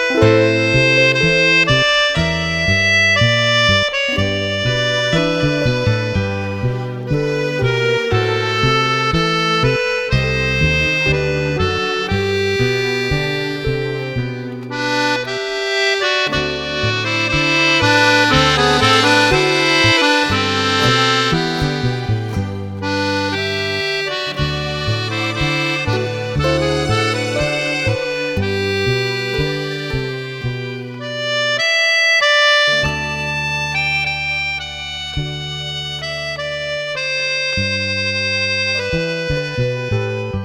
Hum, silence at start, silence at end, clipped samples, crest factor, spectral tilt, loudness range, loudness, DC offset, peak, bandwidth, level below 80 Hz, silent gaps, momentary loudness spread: none; 0 s; 0 s; under 0.1%; 16 dB; -4.5 dB/octave; 7 LU; -16 LUFS; under 0.1%; 0 dBFS; 15.5 kHz; -36 dBFS; none; 11 LU